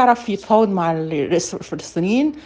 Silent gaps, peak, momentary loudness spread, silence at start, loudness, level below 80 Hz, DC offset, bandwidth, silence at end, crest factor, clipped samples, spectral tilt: none; -2 dBFS; 10 LU; 0 s; -19 LUFS; -56 dBFS; under 0.1%; 10 kHz; 0.05 s; 16 dB; under 0.1%; -5.5 dB/octave